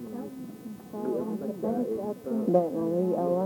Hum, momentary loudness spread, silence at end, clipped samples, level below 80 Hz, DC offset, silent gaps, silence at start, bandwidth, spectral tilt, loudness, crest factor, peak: none; 15 LU; 0 s; under 0.1%; -70 dBFS; under 0.1%; none; 0 s; 19 kHz; -9 dB/octave; -29 LUFS; 20 dB; -10 dBFS